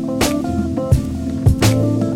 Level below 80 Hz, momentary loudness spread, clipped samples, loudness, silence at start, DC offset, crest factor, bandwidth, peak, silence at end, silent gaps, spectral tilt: -26 dBFS; 6 LU; under 0.1%; -17 LUFS; 0 s; under 0.1%; 14 dB; 16.5 kHz; -2 dBFS; 0 s; none; -6 dB/octave